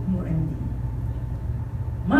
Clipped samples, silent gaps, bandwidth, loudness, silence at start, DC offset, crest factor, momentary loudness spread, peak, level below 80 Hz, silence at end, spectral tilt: under 0.1%; none; 4.4 kHz; -29 LUFS; 0 s; under 0.1%; 18 dB; 5 LU; -8 dBFS; -34 dBFS; 0 s; -9.5 dB/octave